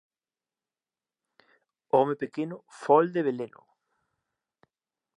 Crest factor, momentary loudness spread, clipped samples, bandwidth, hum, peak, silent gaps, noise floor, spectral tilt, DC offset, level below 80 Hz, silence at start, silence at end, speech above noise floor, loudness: 22 dB; 15 LU; under 0.1%; 10.5 kHz; none; -8 dBFS; none; under -90 dBFS; -7.5 dB/octave; under 0.1%; -88 dBFS; 1.95 s; 1.7 s; over 64 dB; -27 LUFS